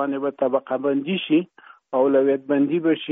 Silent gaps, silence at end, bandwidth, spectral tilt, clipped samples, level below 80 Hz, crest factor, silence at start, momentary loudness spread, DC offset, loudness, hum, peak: none; 0 s; 3.9 kHz; -4.5 dB/octave; under 0.1%; -74 dBFS; 14 dB; 0 s; 6 LU; under 0.1%; -21 LUFS; none; -8 dBFS